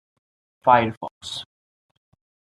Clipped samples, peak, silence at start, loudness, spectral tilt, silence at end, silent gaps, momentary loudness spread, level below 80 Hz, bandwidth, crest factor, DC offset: under 0.1%; -2 dBFS; 0.65 s; -21 LUFS; -5 dB/octave; 1.05 s; 0.97-1.01 s, 1.11-1.21 s; 16 LU; -66 dBFS; 11.5 kHz; 24 dB; under 0.1%